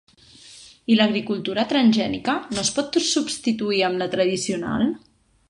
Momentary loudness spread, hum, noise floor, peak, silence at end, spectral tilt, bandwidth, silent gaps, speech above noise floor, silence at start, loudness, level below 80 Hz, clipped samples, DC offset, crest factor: 7 LU; none; -48 dBFS; -6 dBFS; 0.5 s; -3.5 dB/octave; 11.5 kHz; none; 26 dB; 0.45 s; -22 LUFS; -58 dBFS; under 0.1%; under 0.1%; 18 dB